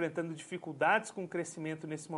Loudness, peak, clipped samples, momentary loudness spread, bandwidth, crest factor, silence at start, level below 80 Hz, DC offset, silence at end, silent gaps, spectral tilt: -35 LUFS; -14 dBFS; under 0.1%; 12 LU; 11.5 kHz; 22 dB; 0 s; -84 dBFS; under 0.1%; 0 s; none; -5 dB/octave